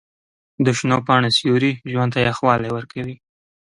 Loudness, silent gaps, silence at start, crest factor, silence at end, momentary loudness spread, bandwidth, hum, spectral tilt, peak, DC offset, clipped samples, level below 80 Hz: -18 LUFS; none; 0.6 s; 18 dB; 0.55 s; 12 LU; 11 kHz; none; -5.5 dB/octave; -2 dBFS; under 0.1%; under 0.1%; -52 dBFS